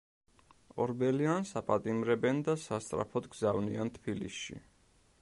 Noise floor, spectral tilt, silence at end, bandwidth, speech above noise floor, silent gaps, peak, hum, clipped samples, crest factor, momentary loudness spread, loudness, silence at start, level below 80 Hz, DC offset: -67 dBFS; -6 dB/octave; 0.6 s; 11.5 kHz; 34 dB; none; -16 dBFS; none; under 0.1%; 20 dB; 10 LU; -34 LUFS; 0.75 s; -64 dBFS; under 0.1%